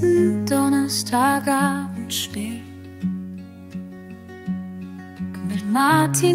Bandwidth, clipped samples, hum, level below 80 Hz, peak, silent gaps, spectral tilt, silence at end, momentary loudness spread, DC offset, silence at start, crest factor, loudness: 16 kHz; under 0.1%; none; -58 dBFS; -6 dBFS; none; -4.5 dB/octave; 0 s; 19 LU; under 0.1%; 0 s; 16 dB; -21 LUFS